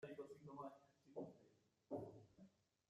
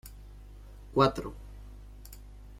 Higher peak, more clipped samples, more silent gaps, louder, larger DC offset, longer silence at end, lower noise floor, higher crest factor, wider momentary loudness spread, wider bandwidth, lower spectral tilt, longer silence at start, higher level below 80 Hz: second, -38 dBFS vs -10 dBFS; neither; neither; second, -57 LUFS vs -28 LUFS; neither; first, 0.4 s vs 0 s; first, -77 dBFS vs -48 dBFS; about the same, 20 dB vs 24 dB; second, 8 LU vs 25 LU; second, 13 kHz vs 16.5 kHz; first, -8 dB/octave vs -6.5 dB/octave; about the same, 0 s vs 0.05 s; second, -90 dBFS vs -48 dBFS